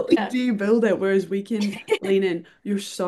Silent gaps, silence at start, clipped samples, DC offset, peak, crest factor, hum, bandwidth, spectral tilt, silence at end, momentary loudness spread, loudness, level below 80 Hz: none; 0 s; under 0.1%; under 0.1%; -6 dBFS; 18 dB; none; 12.5 kHz; -6 dB/octave; 0 s; 8 LU; -23 LUFS; -68 dBFS